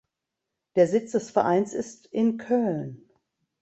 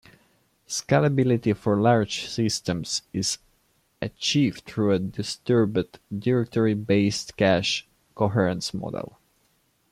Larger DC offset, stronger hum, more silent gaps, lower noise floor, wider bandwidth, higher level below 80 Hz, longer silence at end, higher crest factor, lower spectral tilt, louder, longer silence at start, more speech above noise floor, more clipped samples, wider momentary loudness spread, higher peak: neither; neither; neither; first, -85 dBFS vs -67 dBFS; second, 8.2 kHz vs 15 kHz; second, -70 dBFS vs -58 dBFS; second, 0.65 s vs 0.85 s; about the same, 20 dB vs 18 dB; first, -6.5 dB/octave vs -5 dB/octave; about the same, -25 LUFS vs -24 LUFS; about the same, 0.75 s vs 0.7 s; first, 60 dB vs 43 dB; neither; about the same, 11 LU vs 10 LU; about the same, -8 dBFS vs -6 dBFS